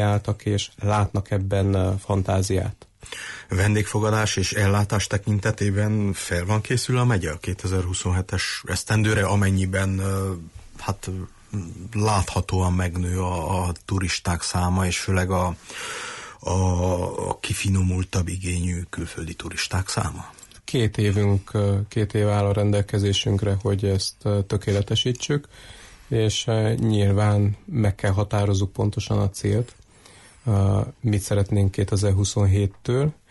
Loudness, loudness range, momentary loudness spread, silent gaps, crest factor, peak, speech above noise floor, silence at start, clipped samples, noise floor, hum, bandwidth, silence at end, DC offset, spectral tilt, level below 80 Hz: -23 LUFS; 3 LU; 10 LU; none; 12 dB; -10 dBFS; 27 dB; 0 s; under 0.1%; -50 dBFS; none; 12 kHz; 0.15 s; under 0.1%; -5.5 dB/octave; -42 dBFS